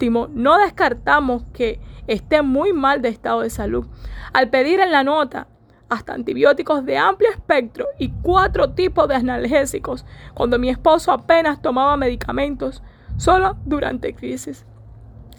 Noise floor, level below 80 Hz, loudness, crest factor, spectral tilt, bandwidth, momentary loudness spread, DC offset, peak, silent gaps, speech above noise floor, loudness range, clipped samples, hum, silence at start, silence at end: -41 dBFS; -36 dBFS; -18 LUFS; 16 dB; -5 dB/octave; 19.5 kHz; 12 LU; under 0.1%; -2 dBFS; none; 23 dB; 2 LU; under 0.1%; none; 0 s; 0.05 s